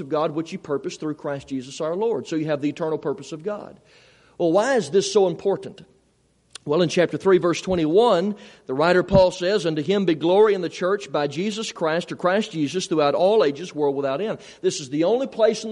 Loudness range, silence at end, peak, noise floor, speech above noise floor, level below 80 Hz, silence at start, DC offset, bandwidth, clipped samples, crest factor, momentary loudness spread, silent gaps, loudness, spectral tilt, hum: 7 LU; 0 s; -4 dBFS; -63 dBFS; 41 dB; -52 dBFS; 0 s; under 0.1%; 11 kHz; under 0.1%; 18 dB; 12 LU; none; -22 LUFS; -5.5 dB/octave; none